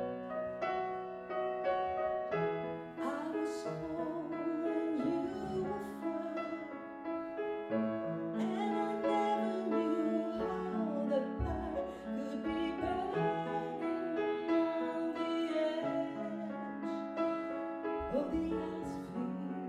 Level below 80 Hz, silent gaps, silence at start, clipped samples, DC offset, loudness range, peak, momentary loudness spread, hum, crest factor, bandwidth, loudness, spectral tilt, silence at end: -56 dBFS; none; 0 s; under 0.1%; under 0.1%; 3 LU; -22 dBFS; 7 LU; none; 14 dB; 11 kHz; -37 LUFS; -7 dB/octave; 0 s